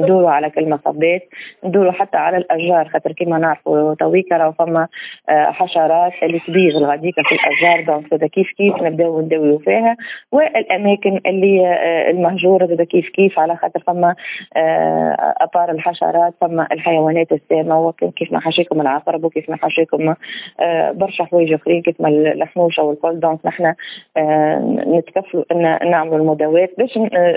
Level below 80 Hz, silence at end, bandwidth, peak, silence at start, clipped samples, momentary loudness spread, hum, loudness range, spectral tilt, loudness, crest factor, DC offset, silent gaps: -68 dBFS; 0 s; 4 kHz; 0 dBFS; 0 s; under 0.1%; 6 LU; none; 2 LU; -10 dB/octave; -15 LUFS; 14 dB; under 0.1%; none